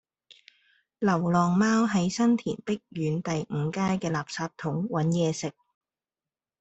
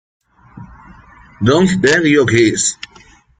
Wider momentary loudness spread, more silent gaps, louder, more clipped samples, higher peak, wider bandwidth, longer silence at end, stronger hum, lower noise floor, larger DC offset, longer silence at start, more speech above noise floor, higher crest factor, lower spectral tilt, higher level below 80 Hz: about the same, 9 LU vs 11 LU; neither; second, -27 LUFS vs -13 LUFS; neither; second, -12 dBFS vs -2 dBFS; second, 8.2 kHz vs 9.6 kHz; first, 1.1 s vs 0.65 s; neither; first, under -90 dBFS vs -45 dBFS; neither; first, 1 s vs 0.55 s; first, over 64 dB vs 33 dB; about the same, 16 dB vs 14 dB; first, -6 dB/octave vs -4.5 dB/octave; second, -64 dBFS vs -46 dBFS